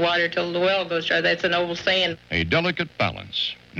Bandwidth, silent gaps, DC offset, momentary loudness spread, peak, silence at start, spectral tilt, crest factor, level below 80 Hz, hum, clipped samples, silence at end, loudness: 8 kHz; none; under 0.1%; 5 LU; -8 dBFS; 0 s; -5 dB/octave; 16 dB; -50 dBFS; none; under 0.1%; 0 s; -22 LUFS